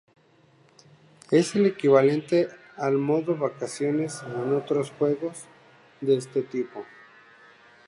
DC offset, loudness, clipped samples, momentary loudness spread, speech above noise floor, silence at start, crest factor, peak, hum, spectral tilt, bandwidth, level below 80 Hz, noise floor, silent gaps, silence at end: under 0.1%; -25 LUFS; under 0.1%; 12 LU; 35 dB; 1.3 s; 20 dB; -6 dBFS; none; -6 dB/octave; 11.5 kHz; -74 dBFS; -59 dBFS; none; 1.05 s